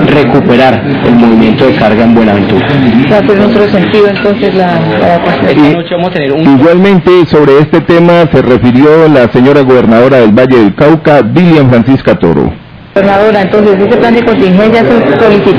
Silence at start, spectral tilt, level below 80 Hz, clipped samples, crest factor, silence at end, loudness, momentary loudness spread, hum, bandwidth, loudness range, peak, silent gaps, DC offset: 0 s; -9 dB/octave; -32 dBFS; 20%; 4 dB; 0 s; -5 LUFS; 4 LU; none; 5.4 kHz; 2 LU; 0 dBFS; none; under 0.1%